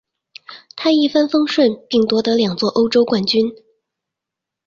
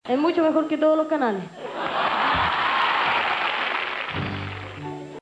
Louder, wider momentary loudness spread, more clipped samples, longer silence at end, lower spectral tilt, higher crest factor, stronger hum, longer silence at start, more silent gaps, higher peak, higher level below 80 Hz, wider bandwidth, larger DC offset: first, -16 LUFS vs -22 LUFS; second, 8 LU vs 13 LU; neither; first, 1.1 s vs 0 s; about the same, -5.5 dB/octave vs -6 dB/octave; about the same, 14 dB vs 14 dB; neither; first, 0.5 s vs 0.05 s; neither; first, -2 dBFS vs -10 dBFS; about the same, -60 dBFS vs -56 dBFS; second, 7.4 kHz vs 10 kHz; neither